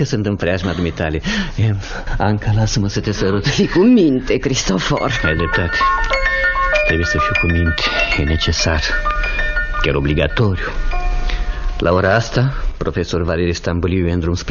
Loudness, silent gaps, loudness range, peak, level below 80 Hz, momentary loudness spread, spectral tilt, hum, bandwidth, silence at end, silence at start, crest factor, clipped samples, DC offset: -17 LUFS; none; 3 LU; 0 dBFS; -24 dBFS; 7 LU; -5.5 dB/octave; none; 7.2 kHz; 0 s; 0 s; 14 dB; under 0.1%; under 0.1%